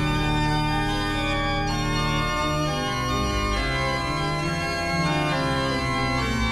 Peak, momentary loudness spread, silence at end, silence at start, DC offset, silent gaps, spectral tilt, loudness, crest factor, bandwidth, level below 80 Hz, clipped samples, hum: -12 dBFS; 2 LU; 0 s; 0 s; under 0.1%; none; -5 dB/octave; -24 LUFS; 12 dB; 14 kHz; -32 dBFS; under 0.1%; 50 Hz at -35 dBFS